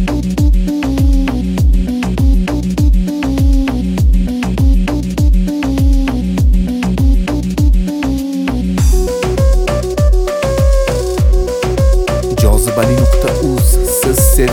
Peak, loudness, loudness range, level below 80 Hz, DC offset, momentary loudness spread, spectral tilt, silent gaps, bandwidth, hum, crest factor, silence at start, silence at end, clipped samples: 0 dBFS; -14 LUFS; 2 LU; -14 dBFS; under 0.1%; 4 LU; -6 dB/octave; none; 19 kHz; none; 10 dB; 0 s; 0 s; under 0.1%